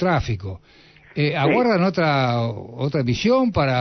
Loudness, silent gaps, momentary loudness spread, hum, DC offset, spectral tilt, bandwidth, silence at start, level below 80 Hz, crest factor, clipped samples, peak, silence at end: -20 LUFS; none; 11 LU; none; under 0.1%; -7 dB/octave; 6.4 kHz; 0 s; -44 dBFS; 14 dB; under 0.1%; -8 dBFS; 0 s